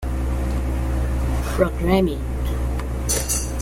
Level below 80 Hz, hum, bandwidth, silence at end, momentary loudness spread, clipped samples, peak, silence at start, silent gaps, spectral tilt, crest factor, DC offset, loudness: -24 dBFS; none; 16.5 kHz; 0 s; 7 LU; under 0.1%; -4 dBFS; 0 s; none; -5 dB/octave; 18 dB; under 0.1%; -23 LUFS